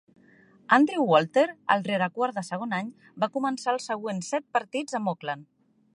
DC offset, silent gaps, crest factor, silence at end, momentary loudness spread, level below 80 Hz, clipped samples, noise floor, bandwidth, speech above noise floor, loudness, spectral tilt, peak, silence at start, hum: under 0.1%; none; 22 dB; 0.5 s; 11 LU; -80 dBFS; under 0.1%; -57 dBFS; 11.5 kHz; 31 dB; -26 LUFS; -5 dB/octave; -6 dBFS; 0.7 s; none